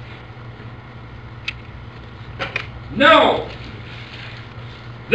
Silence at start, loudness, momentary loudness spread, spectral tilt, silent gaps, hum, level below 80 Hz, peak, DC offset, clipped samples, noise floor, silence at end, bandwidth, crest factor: 0 s; -17 LUFS; 25 LU; -5.5 dB/octave; none; none; -44 dBFS; 0 dBFS; 0.2%; under 0.1%; -36 dBFS; 0 s; 8.8 kHz; 22 dB